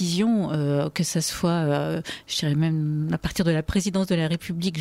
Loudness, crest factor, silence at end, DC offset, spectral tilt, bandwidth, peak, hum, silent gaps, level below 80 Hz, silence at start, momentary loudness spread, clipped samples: -24 LUFS; 12 dB; 0 s; under 0.1%; -5.5 dB/octave; 16 kHz; -10 dBFS; none; none; -46 dBFS; 0 s; 4 LU; under 0.1%